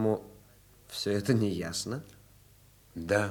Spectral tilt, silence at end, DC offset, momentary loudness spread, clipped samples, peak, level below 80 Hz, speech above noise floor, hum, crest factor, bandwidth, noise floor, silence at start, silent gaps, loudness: -5 dB/octave; 0 s; under 0.1%; 14 LU; under 0.1%; -12 dBFS; -62 dBFS; 29 dB; 50 Hz at -55 dBFS; 20 dB; over 20 kHz; -59 dBFS; 0 s; none; -32 LUFS